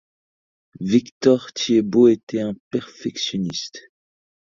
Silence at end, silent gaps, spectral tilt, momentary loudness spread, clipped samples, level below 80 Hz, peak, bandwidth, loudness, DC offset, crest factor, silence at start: 0.8 s; 1.12-1.21 s, 2.23-2.27 s, 2.60-2.71 s; -5.5 dB/octave; 14 LU; under 0.1%; -60 dBFS; -2 dBFS; 7.6 kHz; -20 LUFS; under 0.1%; 20 dB; 0.8 s